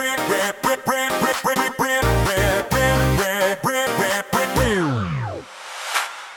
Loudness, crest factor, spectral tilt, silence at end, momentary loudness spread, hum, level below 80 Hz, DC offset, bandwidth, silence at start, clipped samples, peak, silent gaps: -20 LUFS; 16 dB; -4 dB/octave; 0 s; 6 LU; none; -34 dBFS; under 0.1%; 18 kHz; 0 s; under 0.1%; -4 dBFS; none